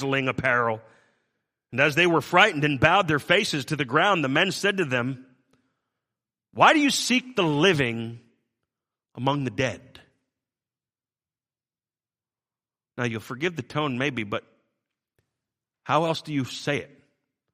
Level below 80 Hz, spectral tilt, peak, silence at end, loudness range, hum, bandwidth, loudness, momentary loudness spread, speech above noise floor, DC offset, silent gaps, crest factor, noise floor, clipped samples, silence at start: -62 dBFS; -4.5 dB/octave; -2 dBFS; 0.7 s; 12 LU; none; 15 kHz; -23 LUFS; 13 LU; over 67 dB; under 0.1%; none; 24 dB; under -90 dBFS; under 0.1%; 0 s